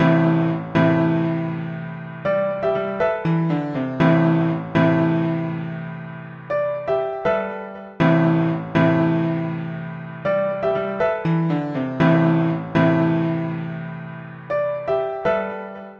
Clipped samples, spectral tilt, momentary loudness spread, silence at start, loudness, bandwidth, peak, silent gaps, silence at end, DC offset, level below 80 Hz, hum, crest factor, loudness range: under 0.1%; -9.5 dB/octave; 14 LU; 0 s; -21 LUFS; 5.6 kHz; -4 dBFS; none; 0 s; under 0.1%; -54 dBFS; none; 16 dB; 3 LU